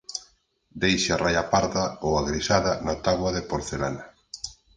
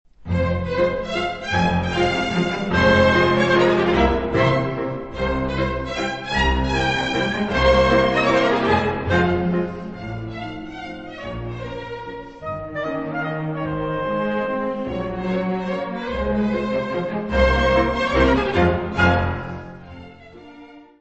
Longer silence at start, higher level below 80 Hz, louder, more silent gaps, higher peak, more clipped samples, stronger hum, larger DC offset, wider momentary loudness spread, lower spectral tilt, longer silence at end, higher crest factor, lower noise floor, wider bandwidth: about the same, 0.1 s vs 0.2 s; second, -44 dBFS vs -32 dBFS; second, -25 LUFS vs -20 LUFS; neither; about the same, -4 dBFS vs -2 dBFS; neither; neither; neither; about the same, 14 LU vs 15 LU; second, -4 dB/octave vs -6.5 dB/octave; about the same, 0.25 s vs 0.15 s; about the same, 22 dB vs 18 dB; first, -63 dBFS vs -43 dBFS; first, 10 kHz vs 8.4 kHz